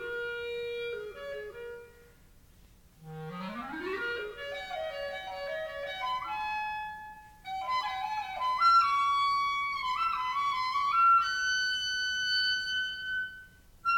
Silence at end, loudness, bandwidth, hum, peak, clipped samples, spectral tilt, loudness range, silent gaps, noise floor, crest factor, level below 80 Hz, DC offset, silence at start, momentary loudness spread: 0 s; -30 LUFS; 18 kHz; none; -16 dBFS; under 0.1%; -1.5 dB/octave; 13 LU; none; -58 dBFS; 16 dB; -62 dBFS; under 0.1%; 0 s; 17 LU